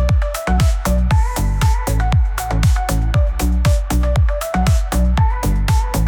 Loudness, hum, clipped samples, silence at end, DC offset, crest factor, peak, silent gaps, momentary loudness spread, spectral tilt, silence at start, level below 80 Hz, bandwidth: -17 LUFS; none; under 0.1%; 0 s; under 0.1%; 10 dB; -6 dBFS; none; 2 LU; -6 dB/octave; 0 s; -16 dBFS; 19 kHz